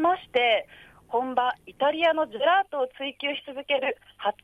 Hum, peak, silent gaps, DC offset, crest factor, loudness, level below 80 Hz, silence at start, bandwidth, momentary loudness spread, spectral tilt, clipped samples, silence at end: none; -10 dBFS; none; under 0.1%; 16 dB; -26 LUFS; -68 dBFS; 0 s; 11 kHz; 8 LU; -4.5 dB/octave; under 0.1%; 0.15 s